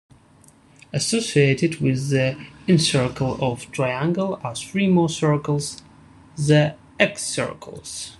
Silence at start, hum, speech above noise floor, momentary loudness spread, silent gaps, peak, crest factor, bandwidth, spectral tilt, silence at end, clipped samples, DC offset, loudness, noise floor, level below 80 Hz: 0.95 s; none; 31 dB; 12 LU; none; -2 dBFS; 20 dB; 12 kHz; -5 dB/octave; 0.05 s; under 0.1%; under 0.1%; -21 LUFS; -52 dBFS; -54 dBFS